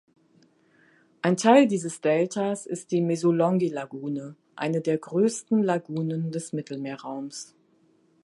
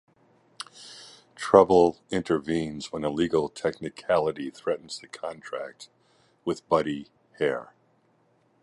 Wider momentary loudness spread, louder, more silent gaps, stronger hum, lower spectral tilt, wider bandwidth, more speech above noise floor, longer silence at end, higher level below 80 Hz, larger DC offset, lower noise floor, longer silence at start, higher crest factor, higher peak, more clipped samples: second, 15 LU vs 21 LU; about the same, -25 LUFS vs -26 LUFS; neither; neither; about the same, -6 dB/octave vs -5.5 dB/octave; about the same, 11.5 kHz vs 11.5 kHz; about the same, 39 dB vs 40 dB; second, 0.8 s vs 1 s; second, -78 dBFS vs -58 dBFS; neither; about the same, -63 dBFS vs -66 dBFS; first, 1.25 s vs 0.6 s; about the same, 22 dB vs 26 dB; about the same, -4 dBFS vs -2 dBFS; neither